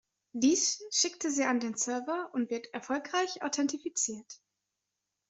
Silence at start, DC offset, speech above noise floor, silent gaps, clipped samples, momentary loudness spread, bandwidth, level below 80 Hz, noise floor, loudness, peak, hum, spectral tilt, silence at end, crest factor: 0.35 s; under 0.1%; 54 dB; none; under 0.1%; 8 LU; 8.2 kHz; -78 dBFS; -86 dBFS; -31 LUFS; -14 dBFS; none; -1 dB/octave; 0.95 s; 18 dB